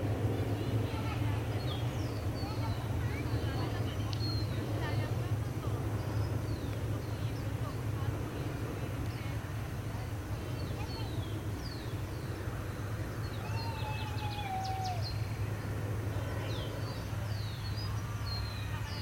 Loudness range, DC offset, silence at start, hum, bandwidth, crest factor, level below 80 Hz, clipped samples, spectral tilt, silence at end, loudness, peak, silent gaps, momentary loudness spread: 3 LU; under 0.1%; 0 s; none; 17 kHz; 14 dB; -46 dBFS; under 0.1%; -6 dB/octave; 0 s; -37 LUFS; -20 dBFS; none; 5 LU